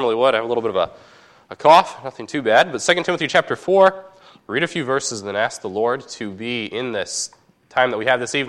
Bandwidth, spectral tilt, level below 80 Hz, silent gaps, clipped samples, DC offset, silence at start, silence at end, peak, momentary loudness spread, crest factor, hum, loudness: 12.5 kHz; -3 dB/octave; -64 dBFS; none; under 0.1%; under 0.1%; 0 s; 0 s; 0 dBFS; 12 LU; 18 dB; none; -19 LUFS